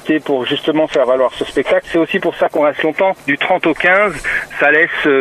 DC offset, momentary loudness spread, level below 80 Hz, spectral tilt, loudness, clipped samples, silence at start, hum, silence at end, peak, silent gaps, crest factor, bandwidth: under 0.1%; 5 LU; -46 dBFS; -5 dB/octave; -14 LUFS; under 0.1%; 0.05 s; none; 0 s; 0 dBFS; none; 14 dB; 14 kHz